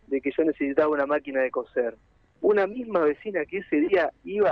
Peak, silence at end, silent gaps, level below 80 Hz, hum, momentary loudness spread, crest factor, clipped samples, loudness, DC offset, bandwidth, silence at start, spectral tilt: -8 dBFS; 0 s; none; -62 dBFS; none; 6 LU; 16 dB; under 0.1%; -25 LUFS; under 0.1%; 5.6 kHz; 0.1 s; -8 dB/octave